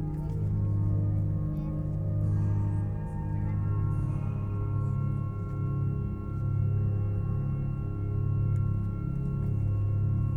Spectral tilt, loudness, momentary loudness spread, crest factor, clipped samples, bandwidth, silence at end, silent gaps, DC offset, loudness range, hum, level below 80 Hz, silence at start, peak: -11.5 dB/octave; -30 LUFS; 5 LU; 10 dB; under 0.1%; 2.9 kHz; 0 s; none; under 0.1%; 1 LU; none; -38 dBFS; 0 s; -18 dBFS